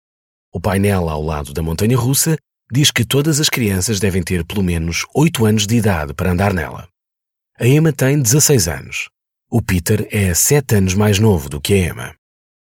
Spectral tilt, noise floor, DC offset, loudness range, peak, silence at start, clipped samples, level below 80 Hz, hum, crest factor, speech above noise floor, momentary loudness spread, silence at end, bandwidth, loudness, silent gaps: -4.5 dB/octave; -83 dBFS; under 0.1%; 2 LU; 0 dBFS; 0.55 s; under 0.1%; -36 dBFS; none; 16 dB; 67 dB; 10 LU; 0.5 s; 19 kHz; -16 LUFS; none